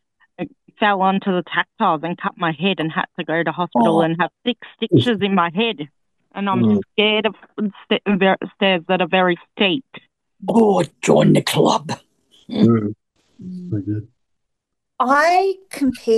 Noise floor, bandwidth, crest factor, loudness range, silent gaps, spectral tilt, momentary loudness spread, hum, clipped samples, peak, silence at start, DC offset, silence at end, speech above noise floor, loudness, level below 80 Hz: -79 dBFS; 12.5 kHz; 18 dB; 4 LU; none; -5.5 dB/octave; 13 LU; none; under 0.1%; -2 dBFS; 0.4 s; under 0.1%; 0 s; 61 dB; -18 LUFS; -60 dBFS